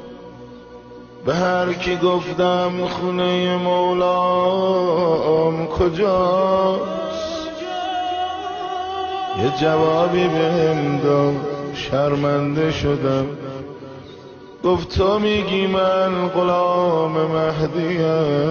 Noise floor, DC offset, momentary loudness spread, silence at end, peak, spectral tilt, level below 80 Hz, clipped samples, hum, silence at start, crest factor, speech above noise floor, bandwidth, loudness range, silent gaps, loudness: -39 dBFS; under 0.1%; 10 LU; 0 s; -6 dBFS; -6.5 dB/octave; -44 dBFS; under 0.1%; none; 0 s; 14 dB; 21 dB; 7 kHz; 4 LU; none; -19 LUFS